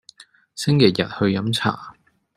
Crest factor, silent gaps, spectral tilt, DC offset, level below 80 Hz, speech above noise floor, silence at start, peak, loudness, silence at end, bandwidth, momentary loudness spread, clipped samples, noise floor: 20 dB; none; -6 dB/octave; under 0.1%; -58 dBFS; 30 dB; 0.55 s; -2 dBFS; -20 LUFS; 0.45 s; 14 kHz; 14 LU; under 0.1%; -49 dBFS